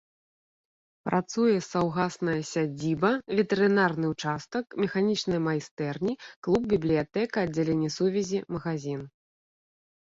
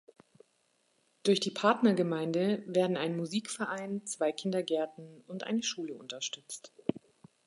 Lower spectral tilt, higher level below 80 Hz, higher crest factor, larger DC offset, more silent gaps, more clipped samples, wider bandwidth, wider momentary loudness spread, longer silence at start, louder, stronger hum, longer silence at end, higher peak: first, -6 dB/octave vs -4.5 dB/octave; first, -60 dBFS vs -80 dBFS; about the same, 18 dB vs 20 dB; neither; first, 5.71-5.77 s, 6.36-6.42 s vs none; neither; second, 7.8 kHz vs 11.5 kHz; second, 8 LU vs 13 LU; second, 1.05 s vs 1.25 s; first, -28 LUFS vs -32 LUFS; neither; first, 1.1 s vs 0.5 s; first, -10 dBFS vs -14 dBFS